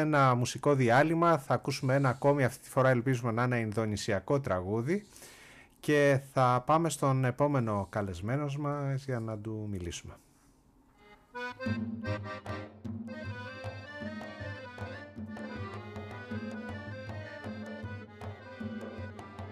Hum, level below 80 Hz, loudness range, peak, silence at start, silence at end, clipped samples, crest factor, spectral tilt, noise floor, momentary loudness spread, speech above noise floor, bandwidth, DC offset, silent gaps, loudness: none; -62 dBFS; 14 LU; -14 dBFS; 0 s; 0 s; under 0.1%; 18 dB; -6.5 dB/octave; -63 dBFS; 17 LU; 34 dB; 14.5 kHz; under 0.1%; none; -31 LUFS